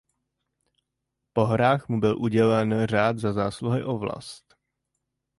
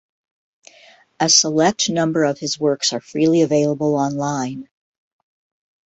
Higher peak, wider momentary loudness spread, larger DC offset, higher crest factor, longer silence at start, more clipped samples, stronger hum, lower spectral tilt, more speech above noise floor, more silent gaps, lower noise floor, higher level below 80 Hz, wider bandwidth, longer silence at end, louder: second, -6 dBFS vs 0 dBFS; about the same, 9 LU vs 9 LU; neither; about the same, 18 dB vs 20 dB; first, 1.35 s vs 1.2 s; neither; neither; first, -7.5 dB/octave vs -3.5 dB/octave; first, 58 dB vs 32 dB; neither; first, -82 dBFS vs -50 dBFS; first, -56 dBFS vs -62 dBFS; first, 11.5 kHz vs 8.2 kHz; second, 1 s vs 1.25 s; second, -24 LUFS vs -18 LUFS